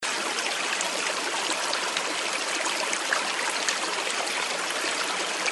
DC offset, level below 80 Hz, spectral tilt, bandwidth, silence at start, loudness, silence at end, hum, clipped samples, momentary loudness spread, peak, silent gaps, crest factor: under 0.1%; -78 dBFS; 0.5 dB/octave; over 20 kHz; 0 s; -26 LUFS; 0 s; none; under 0.1%; 1 LU; -8 dBFS; none; 20 dB